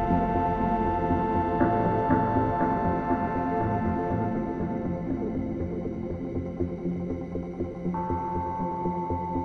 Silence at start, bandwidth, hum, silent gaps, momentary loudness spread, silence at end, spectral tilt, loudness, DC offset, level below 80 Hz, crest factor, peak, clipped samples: 0 s; 6.4 kHz; none; none; 8 LU; 0 s; -10 dB/octave; -28 LUFS; under 0.1%; -42 dBFS; 18 dB; -10 dBFS; under 0.1%